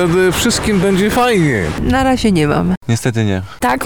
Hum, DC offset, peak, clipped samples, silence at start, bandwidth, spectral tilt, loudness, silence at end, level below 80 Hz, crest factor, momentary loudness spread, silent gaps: none; 1%; -4 dBFS; under 0.1%; 0 s; 19.5 kHz; -5 dB/octave; -14 LUFS; 0 s; -30 dBFS; 10 dB; 5 LU; 2.77-2.81 s